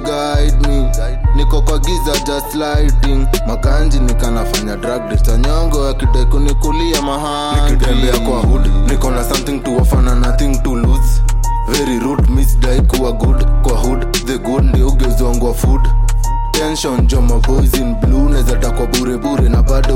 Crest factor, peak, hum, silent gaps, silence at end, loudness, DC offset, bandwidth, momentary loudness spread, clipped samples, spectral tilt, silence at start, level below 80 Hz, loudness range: 8 dB; -2 dBFS; none; none; 0 s; -15 LUFS; under 0.1%; 16.5 kHz; 4 LU; under 0.1%; -5.5 dB/octave; 0 s; -12 dBFS; 1 LU